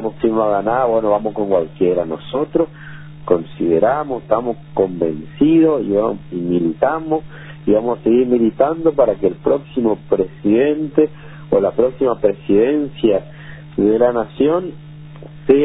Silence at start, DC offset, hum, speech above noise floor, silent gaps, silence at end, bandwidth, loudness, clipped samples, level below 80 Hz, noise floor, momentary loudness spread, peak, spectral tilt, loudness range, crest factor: 0 s; under 0.1%; none; 19 dB; none; 0 s; 4 kHz; -17 LUFS; under 0.1%; -46 dBFS; -35 dBFS; 10 LU; 0 dBFS; -12 dB/octave; 2 LU; 16 dB